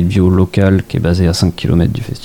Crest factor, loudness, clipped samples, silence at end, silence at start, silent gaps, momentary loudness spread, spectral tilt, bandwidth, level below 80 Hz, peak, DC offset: 12 dB; -13 LUFS; under 0.1%; 0 s; 0 s; none; 3 LU; -7 dB/octave; 15.5 kHz; -28 dBFS; 0 dBFS; under 0.1%